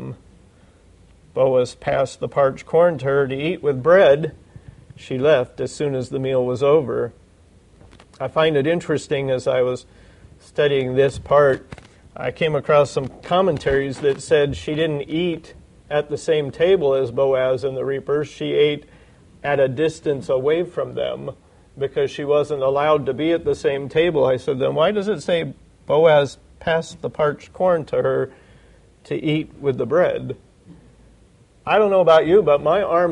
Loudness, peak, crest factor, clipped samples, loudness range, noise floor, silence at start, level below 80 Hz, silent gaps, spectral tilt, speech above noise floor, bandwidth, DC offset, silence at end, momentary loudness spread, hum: -20 LUFS; -4 dBFS; 16 dB; under 0.1%; 4 LU; -52 dBFS; 0 s; -50 dBFS; none; -6 dB/octave; 33 dB; 10.5 kHz; under 0.1%; 0 s; 11 LU; none